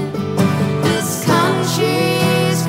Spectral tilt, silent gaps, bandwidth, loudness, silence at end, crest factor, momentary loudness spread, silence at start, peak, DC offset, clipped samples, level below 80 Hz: -5 dB/octave; none; 16.5 kHz; -16 LUFS; 0 s; 16 dB; 3 LU; 0 s; 0 dBFS; under 0.1%; under 0.1%; -52 dBFS